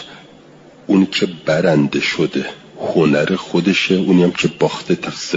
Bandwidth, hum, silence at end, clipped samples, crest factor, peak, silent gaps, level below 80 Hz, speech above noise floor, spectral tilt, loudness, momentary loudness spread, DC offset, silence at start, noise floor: 7.8 kHz; none; 0 s; under 0.1%; 14 dB; -2 dBFS; none; -54 dBFS; 27 dB; -5.5 dB/octave; -16 LUFS; 9 LU; under 0.1%; 0 s; -43 dBFS